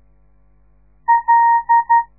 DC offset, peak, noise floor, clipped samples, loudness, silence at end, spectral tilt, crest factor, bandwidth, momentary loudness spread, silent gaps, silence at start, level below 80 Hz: 0.2%; -4 dBFS; -55 dBFS; under 0.1%; -14 LUFS; 0.15 s; -7 dB/octave; 12 dB; 2.1 kHz; 5 LU; none; 1.1 s; -54 dBFS